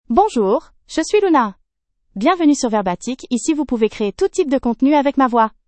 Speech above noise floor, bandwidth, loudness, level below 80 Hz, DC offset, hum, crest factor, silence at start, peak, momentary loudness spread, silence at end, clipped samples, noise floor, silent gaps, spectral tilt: 52 dB; 8.8 kHz; -17 LUFS; -46 dBFS; under 0.1%; none; 16 dB; 0.1 s; 0 dBFS; 8 LU; 0.2 s; under 0.1%; -68 dBFS; none; -4.5 dB/octave